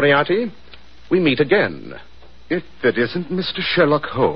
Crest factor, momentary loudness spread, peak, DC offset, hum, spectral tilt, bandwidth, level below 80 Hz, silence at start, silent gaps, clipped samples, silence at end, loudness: 16 dB; 12 LU; -2 dBFS; 1%; none; -8.5 dB/octave; 5.8 kHz; -50 dBFS; 0 s; none; under 0.1%; 0 s; -19 LUFS